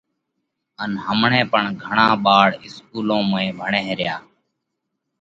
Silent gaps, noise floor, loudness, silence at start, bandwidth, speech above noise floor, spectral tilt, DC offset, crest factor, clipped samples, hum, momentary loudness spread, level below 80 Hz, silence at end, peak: none; -77 dBFS; -18 LUFS; 0.8 s; 7.8 kHz; 58 dB; -6 dB/octave; under 0.1%; 20 dB; under 0.1%; none; 14 LU; -60 dBFS; 1 s; 0 dBFS